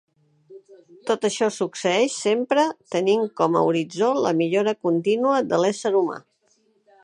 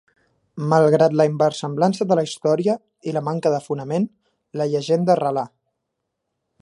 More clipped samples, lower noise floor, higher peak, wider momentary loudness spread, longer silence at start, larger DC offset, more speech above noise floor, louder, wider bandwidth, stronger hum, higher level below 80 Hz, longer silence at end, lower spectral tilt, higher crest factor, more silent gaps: neither; second, -64 dBFS vs -78 dBFS; second, -6 dBFS vs -2 dBFS; second, 4 LU vs 11 LU; about the same, 0.5 s vs 0.55 s; neither; second, 43 dB vs 59 dB; about the same, -22 LUFS vs -20 LUFS; about the same, 11 kHz vs 11.5 kHz; neither; about the same, -74 dBFS vs -70 dBFS; second, 0.85 s vs 1.15 s; second, -4.5 dB/octave vs -6.5 dB/octave; about the same, 18 dB vs 18 dB; neither